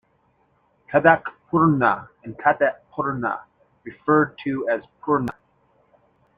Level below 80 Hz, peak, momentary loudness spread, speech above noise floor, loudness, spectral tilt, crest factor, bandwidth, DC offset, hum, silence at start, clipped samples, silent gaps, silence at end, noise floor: -60 dBFS; -2 dBFS; 13 LU; 43 dB; -22 LUFS; -9 dB/octave; 22 dB; 5 kHz; under 0.1%; none; 0.9 s; under 0.1%; none; 1.05 s; -64 dBFS